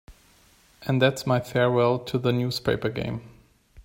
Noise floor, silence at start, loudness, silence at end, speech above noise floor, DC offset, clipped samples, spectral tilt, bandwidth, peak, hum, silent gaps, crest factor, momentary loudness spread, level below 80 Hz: -58 dBFS; 0.1 s; -24 LUFS; 0.05 s; 34 dB; under 0.1%; under 0.1%; -6 dB/octave; 16.5 kHz; -6 dBFS; none; none; 20 dB; 11 LU; -54 dBFS